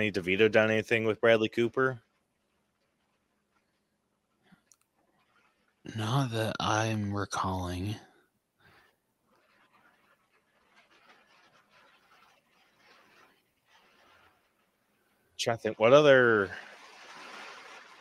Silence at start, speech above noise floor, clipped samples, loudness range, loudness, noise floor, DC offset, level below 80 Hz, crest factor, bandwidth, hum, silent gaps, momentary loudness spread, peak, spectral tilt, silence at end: 0 s; 51 dB; under 0.1%; 14 LU; -27 LUFS; -78 dBFS; under 0.1%; -68 dBFS; 24 dB; 12.5 kHz; none; none; 26 LU; -8 dBFS; -5 dB/octave; 0.2 s